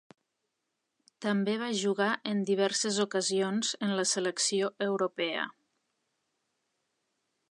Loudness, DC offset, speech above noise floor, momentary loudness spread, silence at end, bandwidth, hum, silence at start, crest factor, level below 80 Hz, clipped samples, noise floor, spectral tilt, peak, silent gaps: -30 LUFS; under 0.1%; 53 dB; 4 LU; 2 s; 11 kHz; none; 1.2 s; 18 dB; -84 dBFS; under 0.1%; -83 dBFS; -3 dB/octave; -14 dBFS; none